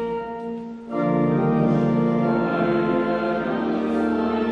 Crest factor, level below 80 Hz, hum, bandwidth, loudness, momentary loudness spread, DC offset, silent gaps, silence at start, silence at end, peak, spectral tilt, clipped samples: 14 dB; -50 dBFS; none; 6.4 kHz; -22 LUFS; 10 LU; under 0.1%; none; 0 s; 0 s; -8 dBFS; -9 dB/octave; under 0.1%